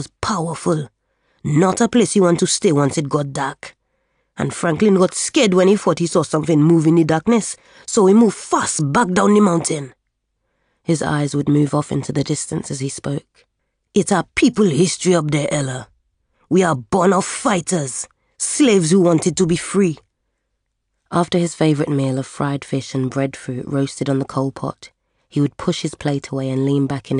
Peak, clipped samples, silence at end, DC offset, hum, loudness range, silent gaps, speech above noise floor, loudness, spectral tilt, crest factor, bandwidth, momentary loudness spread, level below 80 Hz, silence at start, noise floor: -4 dBFS; under 0.1%; 0 s; under 0.1%; none; 6 LU; none; 56 dB; -18 LUFS; -5.5 dB/octave; 14 dB; 11 kHz; 11 LU; -52 dBFS; 0 s; -73 dBFS